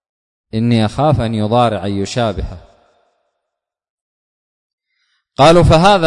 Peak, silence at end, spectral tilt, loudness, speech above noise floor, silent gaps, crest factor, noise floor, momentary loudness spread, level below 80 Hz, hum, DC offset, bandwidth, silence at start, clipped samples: 0 dBFS; 0 s; -6.5 dB/octave; -13 LUFS; 67 dB; 3.90-4.78 s; 14 dB; -79 dBFS; 16 LU; -32 dBFS; none; under 0.1%; 11 kHz; 0.55 s; under 0.1%